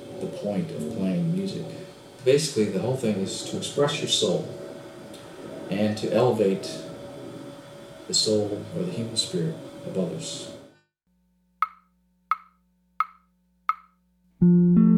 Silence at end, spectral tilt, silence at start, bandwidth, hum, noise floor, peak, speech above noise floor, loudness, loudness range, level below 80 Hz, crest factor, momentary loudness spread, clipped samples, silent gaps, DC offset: 0 s; -5.5 dB/octave; 0 s; 13.5 kHz; none; -69 dBFS; -8 dBFS; 44 dB; -26 LUFS; 8 LU; -60 dBFS; 18 dB; 19 LU; under 0.1%; none; under 0.1%